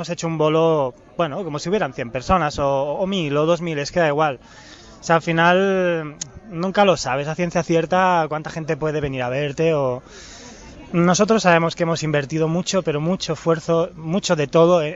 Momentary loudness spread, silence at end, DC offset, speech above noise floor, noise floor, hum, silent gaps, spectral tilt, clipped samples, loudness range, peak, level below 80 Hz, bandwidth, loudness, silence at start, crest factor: 11 LU; 0 s; under 0.1%; 20 dB; -40 dBFS; none; none; -5.5 dB/octave; under 0.1%; 2 LU; -2 dBFS; -46 dBFS; 8 kHz; -20 LUFS; 0 s; 16 dB